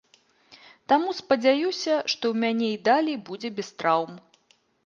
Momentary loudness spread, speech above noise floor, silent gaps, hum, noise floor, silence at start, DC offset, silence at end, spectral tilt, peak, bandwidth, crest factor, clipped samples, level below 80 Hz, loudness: 11 LU; 41 dB; none; none; -65 dBFS; 0.5 s; under 0.1%; 0.65 s; -4 dB/octave; -8 dBFS; 7.4 kHz; 18 dB; under 0.1%; -74 dBFS; -25 LUFS